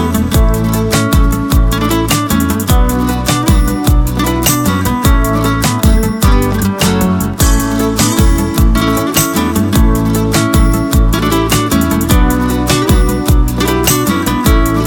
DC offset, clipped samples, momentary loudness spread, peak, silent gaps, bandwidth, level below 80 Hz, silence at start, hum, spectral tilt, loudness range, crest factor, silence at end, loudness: under 0.1%; under 0.1%; 2 LU; 0 dBFS; none; over 20 kHz; -14 dBFS; 0 s; none; -5 dB/octave; 1 LU; 10 dB; 0 s; -12 LUFS